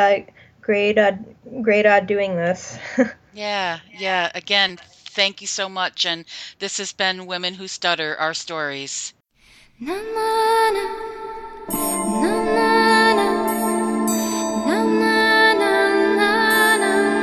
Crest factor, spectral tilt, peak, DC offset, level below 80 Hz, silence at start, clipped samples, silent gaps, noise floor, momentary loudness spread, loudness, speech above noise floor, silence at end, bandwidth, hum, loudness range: 18 dB; -3 dB/octave; -2 dBFS; under 0.1%; -56 dBFS; 0 s; under 0.1%; none; -53 dBFS; 14 LU; -19 LUFS; 31 dB; 0 s; 16 kHz; none; 7 LU